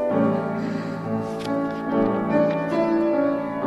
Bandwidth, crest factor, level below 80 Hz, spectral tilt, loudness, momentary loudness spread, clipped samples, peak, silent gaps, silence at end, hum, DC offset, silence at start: 11.5 kHz; 14 dB; -58 dBFS; -8 dB/octave; -23 LUFS; 6 LU; under 0.1%; -8 dBFS; none; 0 s; none; under 0.1%; 0 s